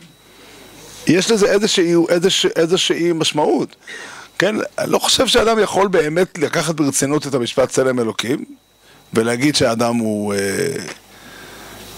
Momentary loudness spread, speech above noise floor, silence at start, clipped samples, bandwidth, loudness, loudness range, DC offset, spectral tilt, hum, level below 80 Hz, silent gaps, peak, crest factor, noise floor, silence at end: 18 LU; 28 dB; 0.55 s; under 0.1%; 16 kHz; -16 LUFS; 4 LU; under 0.1%; -3.5 dB/octave; none; -48 dBFS; none; 0 dBFS; 18 dB; -44 dBFS; 0 s